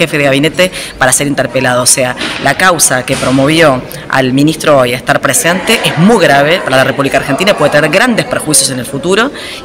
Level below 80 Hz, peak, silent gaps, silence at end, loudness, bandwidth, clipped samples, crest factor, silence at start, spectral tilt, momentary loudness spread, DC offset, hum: -40 dBFS; 0 dBFS; none; 0 s; -9 LUFS; over 20 kHz; 1%; 10 dB; 0 s; -3.5 dB/octave; 5 LU; under 0.1%; none